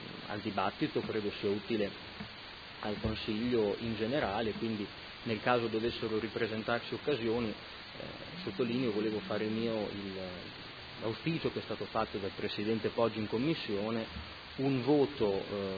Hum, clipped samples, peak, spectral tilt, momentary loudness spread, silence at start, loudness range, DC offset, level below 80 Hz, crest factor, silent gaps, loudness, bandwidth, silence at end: none; under 0.1%; -12 dBFS; -4 dB/octave; 13 LU; 0 s; 3 LU; under 0.1%; -58 dBFS; 22 dB; none; -35 LUFS; 5 kHz; 0 s